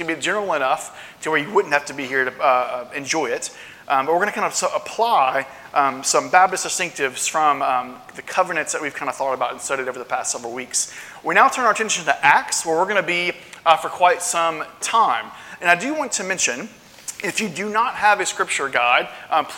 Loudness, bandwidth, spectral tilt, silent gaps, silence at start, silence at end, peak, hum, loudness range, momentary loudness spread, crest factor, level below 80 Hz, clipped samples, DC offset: -20 LUFS; 17 kHz; -1.5 dB/octave; none; 0 s; 0 s; 0 dBFS; none; 4 LU; 10 LU; 20 dB; -66 dBFS; under 0.1%; under 0.1%